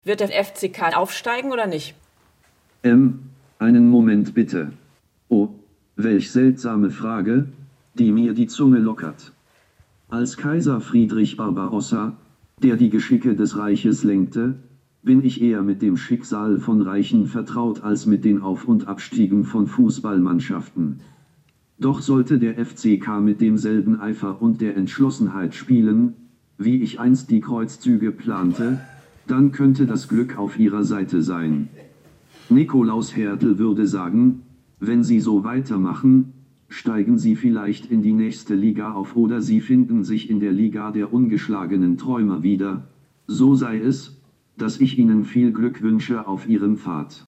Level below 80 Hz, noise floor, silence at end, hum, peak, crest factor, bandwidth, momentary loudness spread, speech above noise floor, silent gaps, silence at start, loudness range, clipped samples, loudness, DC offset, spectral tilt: -66 dBFS; -60 dBFS; 0.1 s; none; -6 dBFS; 14 dB; 10 kHz; 9 LU; 41 dB; none; 0.05 s; 3 LU; under 0.1%; -19 LUFS; under 0.1%; -7 dB/octave